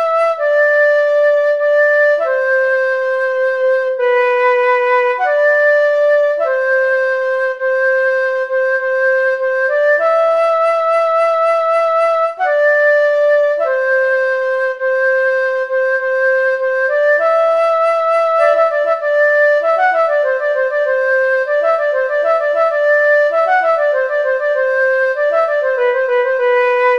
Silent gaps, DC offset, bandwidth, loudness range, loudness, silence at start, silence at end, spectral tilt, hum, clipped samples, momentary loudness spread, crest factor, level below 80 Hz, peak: none; under 0.1%; 9.8 kHz; 2 LU; -13 LUFS; 0 s; 0 s; -0.5 dB/octave; none; under 0.1%; 4 LU; 12 dB; -70 dBFS; -2 dBFS